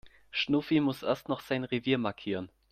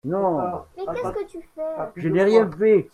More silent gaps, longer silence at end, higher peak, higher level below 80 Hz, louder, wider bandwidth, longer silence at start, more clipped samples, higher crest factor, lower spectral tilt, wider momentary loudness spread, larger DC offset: neither; first, 0.25 s vs 0.1 s; second, -14 dBFS vs -4 dBFS; second, -66 dBFS vs -54 dBFS; second, -31 LUFS vs -22 LUFS; first, 15 kHz vs 9.8 kHz; about the same, 0.05 s vs 0.05 s; neither; about the same, 18 dB vs 18 dB; second, -6.5 dB/octave vs -8 dB/octave; second, 9 LU vs 14 LU; neither